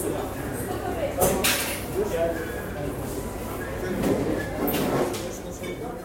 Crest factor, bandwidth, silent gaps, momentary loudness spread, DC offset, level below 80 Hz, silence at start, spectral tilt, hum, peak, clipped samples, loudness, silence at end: 20 dB; 16.5 kHz; none; 10 LU; under 0.1%; -42 dBFS; 0 s; -4 dB/octave; none; -8 dBFS; under 0.1%; -27 LUFS; 0 s